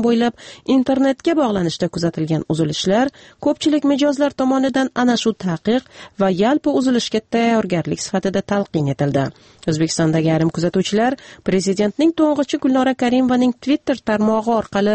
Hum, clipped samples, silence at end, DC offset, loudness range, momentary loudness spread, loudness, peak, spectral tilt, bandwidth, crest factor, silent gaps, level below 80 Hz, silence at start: none; under 0.1%; 0 s; under 0.1%; 2 LU; 5 LU; -18 LUFS; -4 dBFS; -5.5 dB/octave; 8.8 kHz; 12 dB; none; -52 dBFS; 0 s